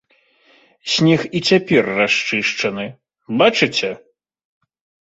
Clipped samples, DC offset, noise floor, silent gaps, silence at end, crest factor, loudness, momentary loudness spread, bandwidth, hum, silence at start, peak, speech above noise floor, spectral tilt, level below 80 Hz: under 0.1%; under 0.1%; -56 dBFS; none; 1.1 s; 18 dB; -16 LUFS; 14 LU; 8.2 kHz; none; 0.85 s; -2 dBFS; 40 dB; -4.5 dB/octave; -58 dBFS